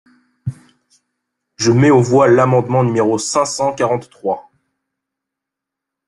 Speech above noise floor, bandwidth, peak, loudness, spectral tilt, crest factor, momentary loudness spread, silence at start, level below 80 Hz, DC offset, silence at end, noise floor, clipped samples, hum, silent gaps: 69 dB; 11.5 kHz; -2 dBFS; -14 LUFS; -6 dB/octave; 16 dB; 17 LU; 0.45 s; -54 dBFS; under 0.1%; 1.65 s; -82 dBFS; under 0.1%; none; none